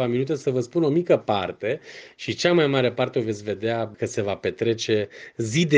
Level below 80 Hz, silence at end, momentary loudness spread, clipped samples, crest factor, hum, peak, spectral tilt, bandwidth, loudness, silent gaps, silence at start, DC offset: -62 dBFS; 0 s; 11 LU; under 0.1%; 20 dB; none; -4 dBFS; -5.5 dB/octave; 9.8 kHz; -24 LUFS; none; 0 s; under 0.1%